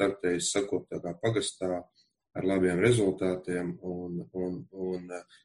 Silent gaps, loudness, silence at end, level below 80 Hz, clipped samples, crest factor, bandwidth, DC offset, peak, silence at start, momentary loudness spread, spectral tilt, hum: none; -30 LUFS; 0.25 s; -62 dBFS; under 0.1%; 20 dB; 11.5 kHz; under 0.1%; -10 dBFS; 0 s; 13 LU; -5 dB/octave; none